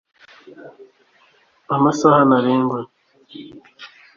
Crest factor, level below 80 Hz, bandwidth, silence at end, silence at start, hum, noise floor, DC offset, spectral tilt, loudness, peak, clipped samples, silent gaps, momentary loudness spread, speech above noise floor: 18 dB; -62 dBFS; 7.4 kHz; 0.3 s; 0.65 s; none; -57 dBFS; under 0.1%; -6.5 dB/octave; -16 LUFS; -2 dBFS; under 0.1%; none; 25 LU; 39 dB